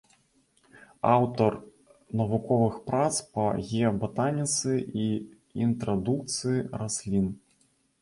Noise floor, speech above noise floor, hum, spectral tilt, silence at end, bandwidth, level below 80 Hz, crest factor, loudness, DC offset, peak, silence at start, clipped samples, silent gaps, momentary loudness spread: -68 dBFS; 41 dB; none; -5.5 dB/octave; 0.65 s; 11.5 kHz; -56 dBFS; 20 dB; -28 LUFS; under 0.1%; -8 dBFS; 0.75 s; under 0.1%; none; 7 LU